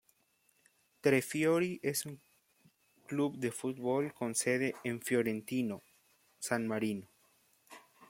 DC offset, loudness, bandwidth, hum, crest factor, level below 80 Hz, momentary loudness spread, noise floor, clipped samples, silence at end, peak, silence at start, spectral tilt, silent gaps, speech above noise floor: under 0.1%; -34 LUFS; 16.5 kHz; none; 22 dB; -80 dBFS; 10 LU; -74 dBFS; under 0.1%; 0.05 s; -16 dBFS; 1.05 s; -4.5 dB/octave; none; 40 dB